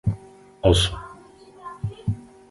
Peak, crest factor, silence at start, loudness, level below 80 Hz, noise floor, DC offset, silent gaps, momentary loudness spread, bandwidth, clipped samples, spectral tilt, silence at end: -2 dBFS; 24 dB; 0.05 s; -24 LUFS; -36 dBFS; -47 dBFS; under 0.1%; none; 22 LU; 11.5 kHz; under 0.1%; -5.5 dB/octave; 0.3 s